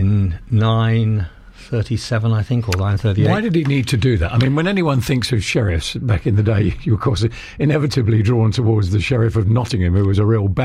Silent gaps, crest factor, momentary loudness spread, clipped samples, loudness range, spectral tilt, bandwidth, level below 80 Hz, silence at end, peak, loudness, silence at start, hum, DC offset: none; 10 dB; 5 LU; under 0.1%; 1 LU; -7 dB/octave; 12.5 kHz; -34 dBFS; 0 s; -6 dBFS; -17 LUFS; 0 s; none; under 0.1%